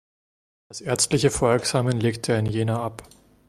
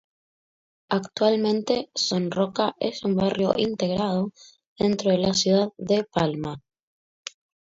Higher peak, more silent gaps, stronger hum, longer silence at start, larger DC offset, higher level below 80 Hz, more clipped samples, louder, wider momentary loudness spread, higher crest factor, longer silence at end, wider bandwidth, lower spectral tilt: about the same, -6 dBFS vs -4 dBFS; second, none vs 4.67-4.76 s; neither; second, 0.7 s vs 0.9 s; neither; first, -50 dBFS vs -58 dBFS; neither; about the same, -23 LUFS vs -24 LUFS; about the same, 11 LU vs 12 LU; about the same, 18 dB vs 20 dB; second, 0.45 s vs 1.15 s; first, 15 kHz vs 7.8 kHz; about the same, -4.5 dB/octave vs -5 dB/octave